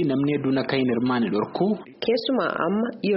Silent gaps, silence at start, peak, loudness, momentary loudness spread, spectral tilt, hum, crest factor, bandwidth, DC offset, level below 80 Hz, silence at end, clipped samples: none; 0 s; -8 dBFS; -24 LUFS; 3 LU; -5 dB/octave; none; 16 dB; 5.8 kHz; under 0.1%; -62 dBFS; 0 s; under 0.1%